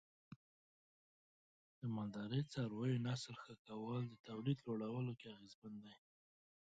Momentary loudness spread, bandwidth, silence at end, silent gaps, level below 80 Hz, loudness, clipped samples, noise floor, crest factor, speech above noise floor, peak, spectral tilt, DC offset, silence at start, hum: 18 LU; 8.8 kHz; 0.7 s; 0.36-1.82 s, 3.59-3.65 s, 4.20-4.24 s, 5.55-5.62 s; -82 dBFS; -46 LUFS; under 0.1%; under -90 dBFS; 18 dB; over 45 dB; -28 dBFS; -7 dB/octave; under 0.1%; 0.3 s; none